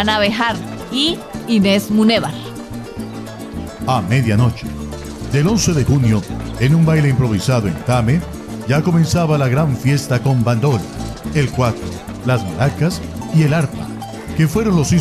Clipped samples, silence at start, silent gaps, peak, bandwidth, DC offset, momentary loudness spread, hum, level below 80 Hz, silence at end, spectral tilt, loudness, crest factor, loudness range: under 0.1%; 0 s; none; -2 dBFS; 14.5 kHz; under 0.1%; 14 LU; none; -34 dBFS; 0 s; -6 dB/octave; -16 LUFS; 14 dB; 3 LU